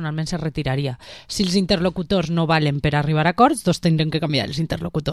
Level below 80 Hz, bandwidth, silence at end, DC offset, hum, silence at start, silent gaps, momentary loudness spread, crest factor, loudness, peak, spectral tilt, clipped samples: -42 dBFS; 12.5 kHz; 0 s; 0.2%; none; 0 s; none; 8 LU; 18 dB; -20 LUFS; -2 dBFS; -6 dB/octave; under 0.1%